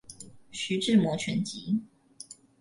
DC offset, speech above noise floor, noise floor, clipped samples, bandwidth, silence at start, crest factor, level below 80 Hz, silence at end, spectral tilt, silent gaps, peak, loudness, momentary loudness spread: under 0.1%; 23 dB; -50 dBFS; under 0.1%; 11.5 kHz; 0.1 s; 18 dB; -66 dBFS; 0.25 s; -5 dB/octave; none; -12 dBFS; -28 LUFS; 22 LU